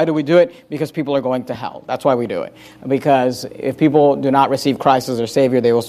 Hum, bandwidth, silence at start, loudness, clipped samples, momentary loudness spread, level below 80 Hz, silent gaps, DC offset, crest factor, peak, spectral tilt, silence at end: none; 15.5 kHz; 0 s; -17 LUFS; under 0.1%; 11 LU; -58 dBFS; none; under 0.1%; 14 dB; -2 dBFS; -6.5 dB/octave; 0 s